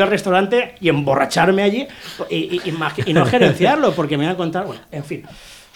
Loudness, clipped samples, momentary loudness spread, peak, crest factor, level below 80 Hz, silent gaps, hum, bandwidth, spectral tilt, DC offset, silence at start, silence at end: -17 LUFS; under 0.1%; 15 LU; -2 dBFS; 16 dB; -52 dBFS; none; none; 18.5 kHz; -6 dB/octave; under 0.1%; 0 s; 0.15 s